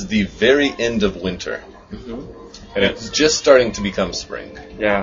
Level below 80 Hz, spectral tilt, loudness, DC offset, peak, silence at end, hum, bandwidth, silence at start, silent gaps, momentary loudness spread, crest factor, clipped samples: -40 dBFS; -3.5 dB/octave; -18 LUFS; under 0.1%; 0 dBFS; 0 s; none; 7.6 kHz; 0 s; none; 21 LU; 18 dB; under 0.1%